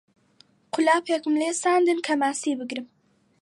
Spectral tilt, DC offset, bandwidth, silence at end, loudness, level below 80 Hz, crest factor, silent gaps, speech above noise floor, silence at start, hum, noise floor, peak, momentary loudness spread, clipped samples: -2 dB/octave; under 0.1%; 11.5 kHz; 0.55 s; -24 LUFS; -80 dBFS; 18 dB; none; 37 dB; 0.75 s; none; -60 dBFS; -8 dBFS; 11 LU; under 0.1%